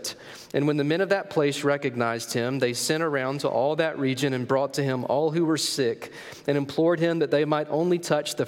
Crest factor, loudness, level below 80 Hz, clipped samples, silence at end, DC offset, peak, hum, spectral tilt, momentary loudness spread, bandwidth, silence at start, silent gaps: 16 dB; -25 LUFS; -74 dBFS; under 0.1%; 0 s; under 0.1%; -10 dBFS; none; -5 dB/octave; 4 LU; 17 kHz; 0 s; none